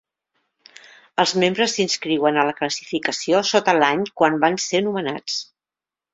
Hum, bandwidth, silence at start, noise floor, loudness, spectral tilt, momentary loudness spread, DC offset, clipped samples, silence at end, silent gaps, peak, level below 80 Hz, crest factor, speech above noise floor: none; 8.4 kHz; 1.2 s; -90 dBFS; -20 LUFS; -3.5 dB/octave; 8 LU; under 0.1%; under 0.1%; 0.7 s; none; -2 dBFS; -66 dBFS; 20 dB; 70 dB